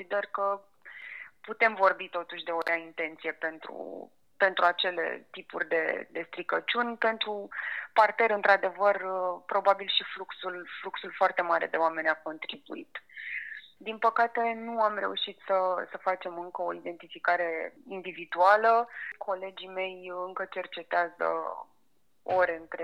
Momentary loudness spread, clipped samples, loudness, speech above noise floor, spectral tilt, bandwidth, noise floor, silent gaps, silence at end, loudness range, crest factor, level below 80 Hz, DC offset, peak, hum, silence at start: 16 LU; under 0.1%; -29 LUFS; 45 dB; -4.5 dB/octave; 12 kHz; -75 dBFS; none; 0 s; 4 LU; 22 dB; -80 dBFS; under 0.1%; -8 dBFS; none; 0 s